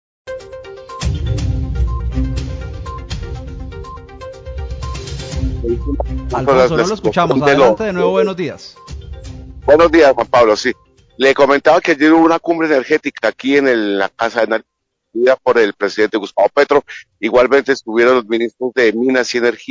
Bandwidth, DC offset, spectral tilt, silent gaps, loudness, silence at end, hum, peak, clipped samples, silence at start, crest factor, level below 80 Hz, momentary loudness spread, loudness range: 7.8 kHz; under 0.1%; -6 dB/octave; none; -14 LUFS; 0.05 s; none; 0 dBFS; under 0.1%; 0.25 s; 14 dB; -28 dBFS; 20 LU; 12 LU